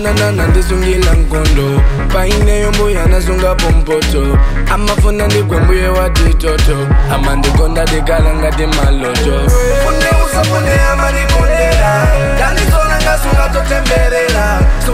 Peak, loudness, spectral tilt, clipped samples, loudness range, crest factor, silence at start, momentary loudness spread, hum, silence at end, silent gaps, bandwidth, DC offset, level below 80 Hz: 0 dBFS; -12 LUFS; -5 dB/octave; under 0.1%; 1 LU; 8 dB; 0 s; 2 LU; none; 0 s; none; 16 kHz; under 0.1%; -12 dBFS